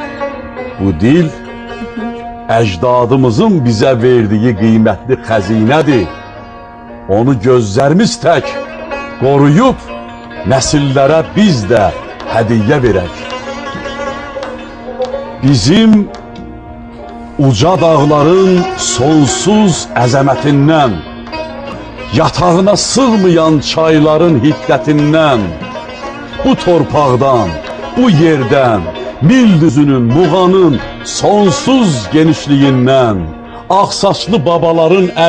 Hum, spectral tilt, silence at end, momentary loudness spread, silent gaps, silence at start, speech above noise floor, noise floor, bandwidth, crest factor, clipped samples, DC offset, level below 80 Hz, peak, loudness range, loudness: none; -6 dB/octave; 0 s; 15 LU; none; 0 s; 21 dB; -30 dBFS; 10 kHz; 10 dB; under 0.1%; under 0.1%; -34 dBFS; 0 dBFS; 4 LU; -10 LUFS